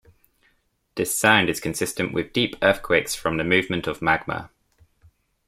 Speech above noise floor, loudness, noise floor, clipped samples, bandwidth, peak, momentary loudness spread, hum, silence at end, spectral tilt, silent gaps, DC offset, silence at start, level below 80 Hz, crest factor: 44 dB; -22 LUFS; -67 dBFS; under 0.1%; 16 kHz; -2 dBFS; 10 LU; none; 1 s; -3.5 dB/octave; none; under 0.1%; 0.95 s; -52 dBFS; 24 dB